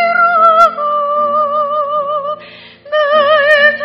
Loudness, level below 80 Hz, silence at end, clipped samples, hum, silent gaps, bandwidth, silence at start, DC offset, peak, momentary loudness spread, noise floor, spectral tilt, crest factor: -11 LUFS; -60 dBFS; 0 s; 0.2%; none; none; 8.4 kHz; 0 s; under 0.1%; 0 dBFS; 11 LU; -35 dBFS; -3 dB/octave; 12 dB